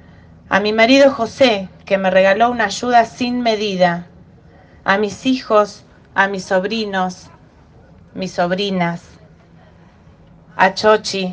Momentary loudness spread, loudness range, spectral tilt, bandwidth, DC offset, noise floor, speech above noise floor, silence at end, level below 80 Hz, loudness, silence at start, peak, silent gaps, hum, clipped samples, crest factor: 11 LU; 9 LU; -4.5 dB/octave; 9.6 kHz; under 0.1%; -46 dBFS; 30 dB; 0 s; -54 dBFS; -16 LUFS; 0.5 s; 0 dBFS; none; none; under 0.1%; 18 dB